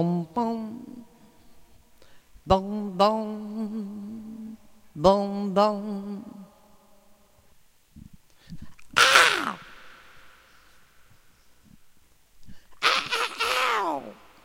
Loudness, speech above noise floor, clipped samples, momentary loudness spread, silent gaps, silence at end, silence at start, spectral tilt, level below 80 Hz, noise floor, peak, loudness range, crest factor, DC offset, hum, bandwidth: -24 LUFS; 31 dB; under 0.1%; 25 LU; none; 0.3 s; 0 s; -3.5 dB/octave; -52 dBFS; -56 dBFS; 0 dBFS; 8 LU; 28 dB; under 0.1%; none; 16 kHz